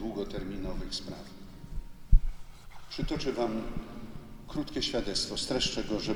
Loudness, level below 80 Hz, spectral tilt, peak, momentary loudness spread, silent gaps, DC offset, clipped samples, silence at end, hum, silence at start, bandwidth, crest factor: -33 LUFS; -34 dBFS; -4.5 dB/octave; -8 dBFS; 17 LU; none; under 0.1%; under 0.1%; 0 s; none; 0 s; 12 kHz; 22 dB